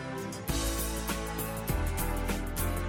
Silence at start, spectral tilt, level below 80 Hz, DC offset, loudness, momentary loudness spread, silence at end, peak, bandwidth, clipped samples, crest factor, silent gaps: 0 s; -4.5 dB/octave; -36 dBFS; under 0.1%; -33 LUFS; 3 LU; 0 s; -18 dBFS; 17 kHz; under 0.1%; 14 dB; none